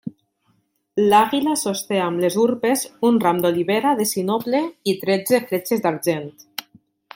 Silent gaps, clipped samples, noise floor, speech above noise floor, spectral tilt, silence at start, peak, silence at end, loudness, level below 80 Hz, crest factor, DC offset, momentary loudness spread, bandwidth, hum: none; under 0.1%; -65 dBFS; 46 dB; -4.5 dB/octave; 0.05 s; -2 dBFS; 0.55 s; -20 LUFS; -66 dBFS; 18 dB; under 0.1%; 12 LU; 17 kHz; none